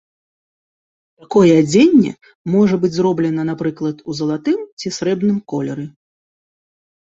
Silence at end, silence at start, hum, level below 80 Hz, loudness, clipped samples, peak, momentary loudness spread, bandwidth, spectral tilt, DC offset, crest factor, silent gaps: 1.25 s; 1.3 s; none; -58 dBFS; -16 LUFS; under 0.1%; -2 dBFS; 13 LU; 8 kHz; -6.5 dB/octave; under 0.1%; 16 dB; 2.35-2.45 s, 4.72-4.77 s